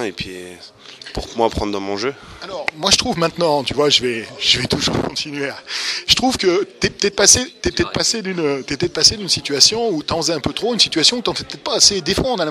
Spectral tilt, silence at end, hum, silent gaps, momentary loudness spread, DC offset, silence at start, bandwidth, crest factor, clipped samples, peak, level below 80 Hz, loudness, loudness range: -2 dB/octave; 0 s; none; none; 13 LU; under 0.1%; 0 s; 15.5 kHz; 18 dB; under 0.1%; 0 dBFS; -40 dBFS; -16 LUFS; 4 LU